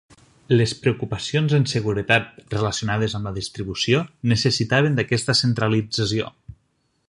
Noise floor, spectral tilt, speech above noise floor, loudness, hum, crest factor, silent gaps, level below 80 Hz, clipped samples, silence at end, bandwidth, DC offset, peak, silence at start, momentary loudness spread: -68 dBFS; -5 dB/octave; 47 dB; -21 LUFS; none; 20 dB; none; -48 dBFS; under 0.1%; 0.55 s; 11.5 kHz; under 0.1%; -2 dBFS; 0.5 s; 8 LU